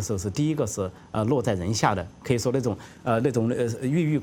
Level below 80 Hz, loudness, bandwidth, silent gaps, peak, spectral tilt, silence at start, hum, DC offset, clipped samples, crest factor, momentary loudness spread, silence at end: -52 dBFS; -26 LUFS; 17.5 kHz; none; -4 dBFS; -6 dB/octave; 0 s; none; under 0.1%; under 0.1%; 20 dB; 7 LU; 0 s